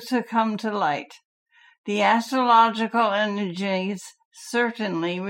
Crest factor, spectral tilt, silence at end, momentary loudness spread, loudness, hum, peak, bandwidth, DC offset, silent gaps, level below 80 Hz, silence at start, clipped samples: 18 dB; -5 dB/octave; 0 s; 16 LU; -23 LUFS; none; -6 dBFS; 16.5 kHz; under 0.1%; 1.25-1.46 s, 1.78-1.84 s, 4.25-4.31 s; -80 dBFS; 0 s; under 0.1%